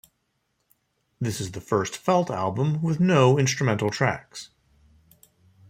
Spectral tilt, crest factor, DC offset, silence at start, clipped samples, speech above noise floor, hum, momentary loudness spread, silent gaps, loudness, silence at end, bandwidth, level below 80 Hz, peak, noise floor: -5.5 dB/octave; 20 dB; under 0.1%; 1.2 s; under 0.1%; 51 dB; none; 13 LU; none; -24 LUFS; 1.25 s; 15.5 kHz; -60 dBFS; -6 dBFS; -74 dBFS